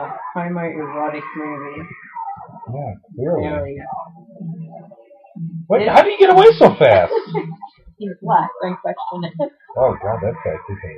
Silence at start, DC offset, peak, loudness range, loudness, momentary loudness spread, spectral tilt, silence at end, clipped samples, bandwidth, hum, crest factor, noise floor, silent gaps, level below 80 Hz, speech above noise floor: 0 s; under 0.1%; 0 dBFS; 14 LU; -16 LUFS; 21 LU; -7.5 dB/octave; 0 s; under 0.1%; 8.4 kHz; none; 18 dB; -45 dBFS; none; -46 dBFS; 28 dB